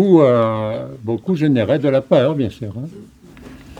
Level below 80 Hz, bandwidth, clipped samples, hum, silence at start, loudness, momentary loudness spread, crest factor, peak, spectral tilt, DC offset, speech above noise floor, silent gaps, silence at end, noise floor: -50 dBFS; 9.6 kHz; under 0.1%; none; 0 s; -17 LUFS; 16 LU; 16 dB; 0 dBFS; -8.5 dB/octave; under 0.1%; 23 dB; none; 0.05 s; -39 dBFS